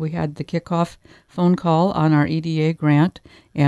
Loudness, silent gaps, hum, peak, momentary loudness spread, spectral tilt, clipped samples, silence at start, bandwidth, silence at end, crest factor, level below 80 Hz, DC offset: -20 LUFS; none; none; -4 dBFS; 9 LU; -8.5 dB/octave; under 0.1%; 0 s; 11 kHz; 0 s; 16 dB; -52 dBFS; under 0.1%